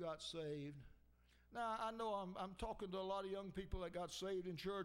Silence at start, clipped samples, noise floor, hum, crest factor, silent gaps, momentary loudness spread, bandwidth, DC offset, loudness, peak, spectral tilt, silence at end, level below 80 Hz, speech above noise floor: 0 s; under 0.1%; -72 dBFS; 60 Hz at -70 dBFS; 16 dB; none; 5 LU; 16 kHz; under 0.1%; -48 LUFS; -32 dBFS; -5 dB/octave; 0 s; -62 dBFS; 25 dB